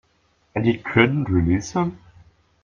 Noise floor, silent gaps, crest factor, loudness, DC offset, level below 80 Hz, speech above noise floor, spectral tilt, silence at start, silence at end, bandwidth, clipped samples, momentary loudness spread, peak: -63 dBFS; none; 22 dB; -21 LUFS; under 0.1%; -46 dBFS; 44 dB; -6.5 dB/octave; 0.55 s; 0.7 s; 7.4 kHz; under 0.1%; 8 LU; -2 dBFS